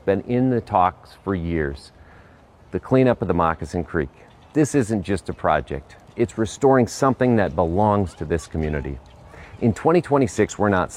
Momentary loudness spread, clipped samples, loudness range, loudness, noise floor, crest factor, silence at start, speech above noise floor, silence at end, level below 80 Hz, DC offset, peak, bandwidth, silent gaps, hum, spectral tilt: 12 LU; under 0.1%; 3 LU; -21 LUFS; -49 dBFS; 18 dB; 0.05 s; 29 dB; 0 s; -40 dBFS; under 0.1%; -4 dBFS; 13 kHz; none; none; -7 dB/octave